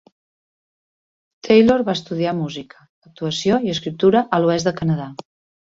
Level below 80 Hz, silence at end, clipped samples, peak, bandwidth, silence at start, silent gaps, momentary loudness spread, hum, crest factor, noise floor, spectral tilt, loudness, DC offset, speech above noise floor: -54 dBFS; 0.45 s; under 0.1%; -2 dBFS; 7.8 kHz; 1.45 s; 2.89-3.02 s; 16 LU; none; 18 dB; under -90 dBFS; -6 dB/octave; -18 LUFS; under 0.1%; over 72 dB